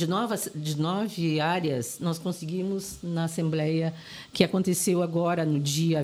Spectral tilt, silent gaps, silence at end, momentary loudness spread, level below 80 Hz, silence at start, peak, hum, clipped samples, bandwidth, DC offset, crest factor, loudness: -5.5 dB/octave; none; 0 s; 7 LU; -62 dBFS; 0 s; -4 dBFS; none; under 0.1%; 15.5 kHz; under 0.1%; 22 dB; -27 LUFS